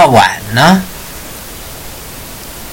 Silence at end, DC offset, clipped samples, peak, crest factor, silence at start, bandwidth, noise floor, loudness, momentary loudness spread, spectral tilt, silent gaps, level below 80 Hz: 0 s; under 0.1%; 0.7%; 0 dBFS; 12 dB; 0 s; 17.5 kHz; -27 dBFS; -9 LUFS; 18 LU; -4.5 dB/octave; none; -36 dBFS